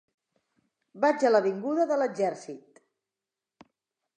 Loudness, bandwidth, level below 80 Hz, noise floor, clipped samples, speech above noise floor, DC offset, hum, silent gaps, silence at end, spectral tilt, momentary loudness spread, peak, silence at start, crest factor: -26 LUFS; 9.6 kHz; -86 dBFS; -90 dBFS; under 0.1%; 64 dB; under 0.1%; none; none; 1.6 s; -5.5 dB/octave; 19 LU; -10 dBFS; 0.95 s; 20 dB